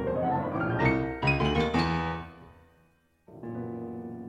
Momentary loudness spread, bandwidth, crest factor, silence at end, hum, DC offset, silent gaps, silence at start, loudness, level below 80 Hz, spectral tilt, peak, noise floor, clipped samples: 13 LU; 9.8 kHz; 18 dB; 0 s; none; under 0.1%; none; 0 s; -29 LUFS; -44 dBFS; -7 dB/octave; -12 dBFS; -66 dBFS; under 0.1%